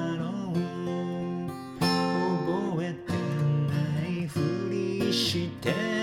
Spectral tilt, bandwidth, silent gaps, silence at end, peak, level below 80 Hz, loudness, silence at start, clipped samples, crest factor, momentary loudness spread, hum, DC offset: -6 dB/octave; 16 kHz; none; 0 s; -10 dBFS; -60 dBFS; -29 LUFS; 0 s; under 0.1%; 18 dB; 6 LU; none; under 0.1%